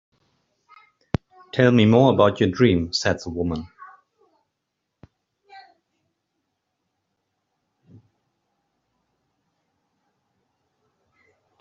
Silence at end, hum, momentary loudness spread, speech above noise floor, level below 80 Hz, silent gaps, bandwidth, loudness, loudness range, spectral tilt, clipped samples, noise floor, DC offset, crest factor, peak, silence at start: 6 s; none; 15 LU; 61 dB; -54 dBFS; none; 7.6 kHz; -20 LUFS; 15 LU; -5.5 dB/octave; under 0.1%; -79 dBFS; under 0.1%; 22 dB; -4 dBFS; 1.55 s